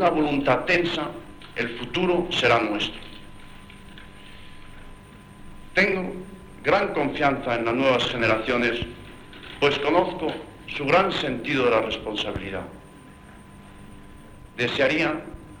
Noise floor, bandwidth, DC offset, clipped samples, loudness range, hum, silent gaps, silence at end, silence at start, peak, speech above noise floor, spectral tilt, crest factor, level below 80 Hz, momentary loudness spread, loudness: -46 dBFS; 19 kHz; under 0.1%; under 0.1%; 6 LU; none; none; 0 s; 0 s; -4 dBFS; 23 dB; -5 dB/octave; 20 dB; -48 dBFS; 22 LU; -23 LUFS